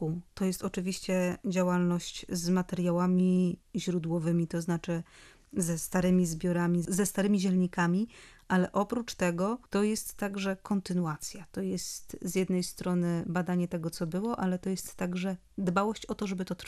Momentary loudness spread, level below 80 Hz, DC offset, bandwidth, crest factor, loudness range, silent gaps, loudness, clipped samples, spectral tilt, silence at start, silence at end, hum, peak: 8 LU; -58 dBFS; under 0.1%; 14.5 kHz; 16 dB; 3 LU; none; -31 LUFS; under 0.1%; -6 dB/octave; 0 s; 0 s; none; -14 dBFS